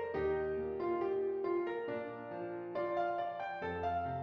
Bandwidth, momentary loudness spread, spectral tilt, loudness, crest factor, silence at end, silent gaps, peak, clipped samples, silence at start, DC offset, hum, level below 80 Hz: 6 kHz; 7 LU; -8.5 dB/octave; -38 LUFS; 12 dB; 0 s; none; -24 dBFS; under 0.1%; 0 s; under 0.1%; none; -66 dBFS